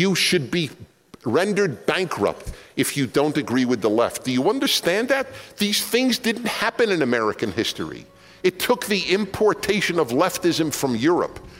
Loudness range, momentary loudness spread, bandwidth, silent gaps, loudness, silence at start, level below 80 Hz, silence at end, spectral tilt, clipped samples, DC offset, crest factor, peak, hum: 2 LU; 6 LU; 16.5 kHz; none; -21 LUFS; 0 s; -52 dBFS; 0 s; -4 dB/octave; under 0.1%; under 0.1%; 16 dB; -6 dBFS; none